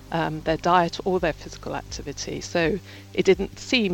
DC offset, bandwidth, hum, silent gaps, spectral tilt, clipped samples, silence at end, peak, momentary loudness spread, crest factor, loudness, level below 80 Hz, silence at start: under 0.1%; 17 kHz; none; none; -5 dB/octave; under 0.1%; 0 s; -4 dBFS; 12 LU; 20 dB; -25 LUFS; -44 dBFS; 0 s